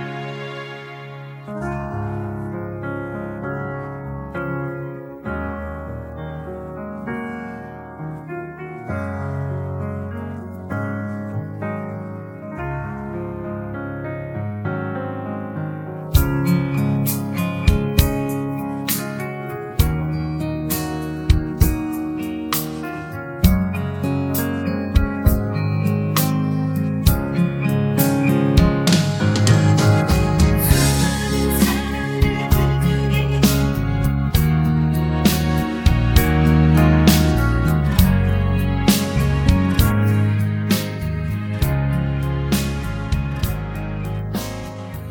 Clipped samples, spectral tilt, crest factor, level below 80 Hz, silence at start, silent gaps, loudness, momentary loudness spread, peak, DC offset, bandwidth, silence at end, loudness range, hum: under 0.1%; -6 dB/octave; 20 dB; -26 dBFS; 0 s; none; -20 LUFS; 14 LU; 0 dBFS; under 0.1%; 18 kHz; 0 s; 12 LU; none